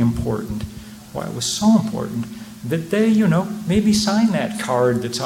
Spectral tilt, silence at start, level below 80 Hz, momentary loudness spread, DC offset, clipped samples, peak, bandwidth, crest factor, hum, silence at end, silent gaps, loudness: -5.5 dB/octave; 0 s; -42 dBFS; 14 LU; under 0.1%; under 0.1%; -4 dBFS; 16.5 kHz; 14 dB; none; 0 s; none; -19 LUFS